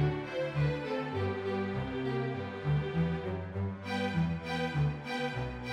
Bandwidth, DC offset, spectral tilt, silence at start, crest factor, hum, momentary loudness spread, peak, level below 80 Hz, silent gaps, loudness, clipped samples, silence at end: 10 kHz; under 0.1%; -7.5 dB/octave; 0 s; 14 dB; none; 5 LU; -20 dBFS; -50 dBFS; none; -34 LUFS; under 0.1%; 0 s